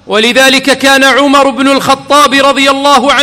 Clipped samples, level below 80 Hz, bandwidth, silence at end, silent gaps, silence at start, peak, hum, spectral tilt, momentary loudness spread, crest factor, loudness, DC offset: 4%; -42 dBFS; over 20 kHz; 0 s; none; 0.05 s; 0 dBFS; none; -2 dB/octave; 3 LU; 6 dB; -6 LUFS; under 0.1%